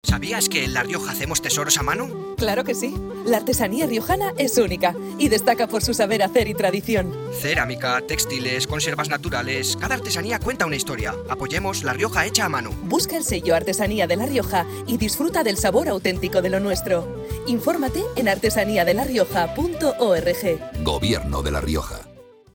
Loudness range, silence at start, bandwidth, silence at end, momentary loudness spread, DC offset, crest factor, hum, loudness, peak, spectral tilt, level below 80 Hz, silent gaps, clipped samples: 2 LU; 0.05 s; 19.5 kHz; 0.3 s; 6 LU; under 0.1%; 20 dB; none; -22 LUFS; -2 dBFS; -3.5 dB/octave; -38 dBFS; none; under 0.1%